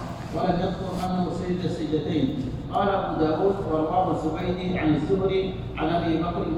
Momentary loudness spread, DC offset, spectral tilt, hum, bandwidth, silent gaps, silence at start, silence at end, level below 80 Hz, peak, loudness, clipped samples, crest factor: 5 LU; under 0.1%; -8 dB/octave; none; 12 kHz; none; 0 s; 0 s; -42 dBFS; -10 dBFS; -25 LUFS; under 0.1%; 14 dB